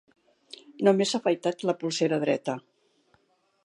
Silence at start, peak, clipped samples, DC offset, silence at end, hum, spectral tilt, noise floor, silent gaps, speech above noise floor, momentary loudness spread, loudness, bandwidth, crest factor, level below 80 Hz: 0.7 s; -8 dBFS; under 0.1%; under 0.1%; 1.05 s; none; -5 dB/octave; -67 dBFS; none; 42 dB; 21 LU; -26 LUFS; 11.5 kHz; 20 dB; -82 dBFS